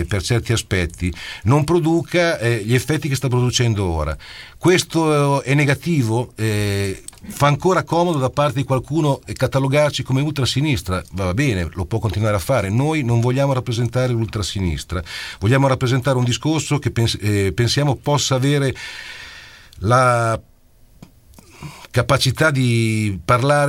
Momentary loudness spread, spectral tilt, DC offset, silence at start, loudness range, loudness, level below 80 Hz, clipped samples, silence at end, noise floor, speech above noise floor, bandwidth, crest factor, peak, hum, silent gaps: 10 LU; -5.5 dB/octave; under 0.1%; 0 s; 2 LU; -19 LUFS; -38 dBFS; under 0.1%; 0 s; -49 dBFS; 31 dB; 16 kHz; 16 dB; -4 dBFS; none; none